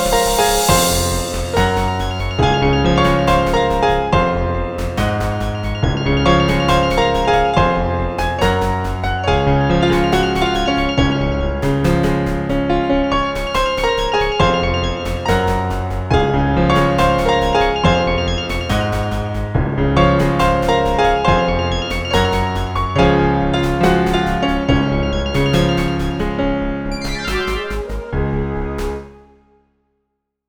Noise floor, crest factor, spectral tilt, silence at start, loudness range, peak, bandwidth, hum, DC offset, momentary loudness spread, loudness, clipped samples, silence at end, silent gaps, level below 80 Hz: -73 dBFS; 16 dB; -5.5 dB/octave; 0 s; 3 LU; 0 dBFS; over 20 kHz; none; under 0.1%; 7 LU; -16 LUFS; under 0.1%; 1.35 s; none; -24 dBFS